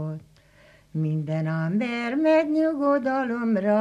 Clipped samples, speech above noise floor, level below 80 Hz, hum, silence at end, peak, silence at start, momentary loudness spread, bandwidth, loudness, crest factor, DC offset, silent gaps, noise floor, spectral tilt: under 0.1%; 32 dB; -66 dBFS; none; 0 s; -10 dBFS; 0 s; 9 LU; 8.6 kHz; -24 LUFS; 14 dB; under 0.1%; none; -55 dBFS; -8.5 dB/octave